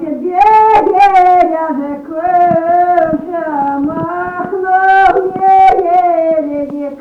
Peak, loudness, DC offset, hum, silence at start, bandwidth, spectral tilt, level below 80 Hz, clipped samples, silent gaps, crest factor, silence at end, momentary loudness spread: -2 dBFS; -10 LUFS; under 0.1%; none; 0 s; 7 kHz; -7 dB/octave; -42 dBFS; under 0.1%; none; 10 dB; 0 s; 11 LU